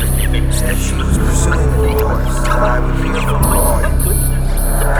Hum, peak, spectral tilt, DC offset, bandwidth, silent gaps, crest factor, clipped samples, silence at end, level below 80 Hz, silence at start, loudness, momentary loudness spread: none; -2 dBFS; -5 dB/octave; under 0.1%; over 20 kHz; none; 10 dB; under 0.1%; 0 s; -14 dBFS; 0 s; -15 LUFS; 3 LU